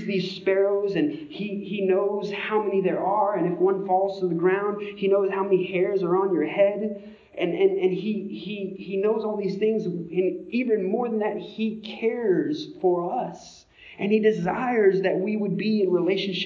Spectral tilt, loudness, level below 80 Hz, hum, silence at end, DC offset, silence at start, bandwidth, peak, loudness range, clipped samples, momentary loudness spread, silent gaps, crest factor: -7.5 dB/octave; -24 LUFS; -68 dBFS; none; 0 s; under 0.1%; 0 s; 7 kHz; -8 dBFS; 3 LU; under 0.1%; 9 LU; none; 16 dB